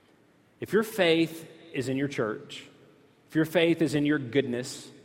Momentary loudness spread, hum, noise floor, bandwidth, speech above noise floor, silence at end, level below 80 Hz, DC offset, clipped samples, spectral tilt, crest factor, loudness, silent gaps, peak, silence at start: 15 LU; none; -62 dBFS; 16.5 kHz; 34 dB; 0.1 s; -68 dBFS; under 0.1%; under 0.1%; -5.5 dB/octave; 20 dB; -27 LUFS; none; -8 dBFS; 0.6 s